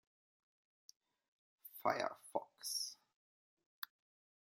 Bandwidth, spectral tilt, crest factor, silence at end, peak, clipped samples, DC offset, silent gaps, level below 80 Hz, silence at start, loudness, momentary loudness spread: 16.5 kHz; -1.5 dB/octave; 28 dB; 0.65 s; -20 dBFS; under 0.1%; under 0.1%; 3.16-3.57 s, 3.66-3.82 s; under -90 dBFS; 1.65 s; -43 LUFS; 17 LU